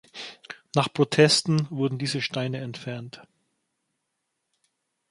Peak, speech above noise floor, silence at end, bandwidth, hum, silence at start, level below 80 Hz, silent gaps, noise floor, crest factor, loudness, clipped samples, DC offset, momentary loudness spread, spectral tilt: -4 dBFS; 55 dB; 1.9 s; 11.5 kHz; none; 0.15 s; -68 dBFS; none; -79 dBFS; 24 dB; -24 LUFS; under 0.1%; under 0.1%; 21 LU; -4.5 dB/octave